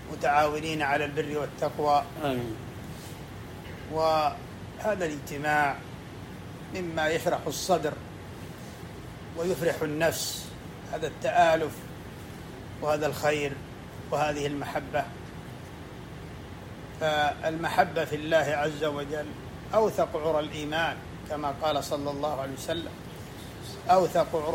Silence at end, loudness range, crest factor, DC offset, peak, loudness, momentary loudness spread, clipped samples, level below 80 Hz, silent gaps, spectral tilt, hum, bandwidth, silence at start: 0 s; 4 LU; 22 dB; under 0.1%; -8 dBFS; -28 LUFS; 17 LU; under 0.1%; -54 dBFS; none; -4.5 dB/octave; none; 16 kHz; 0 s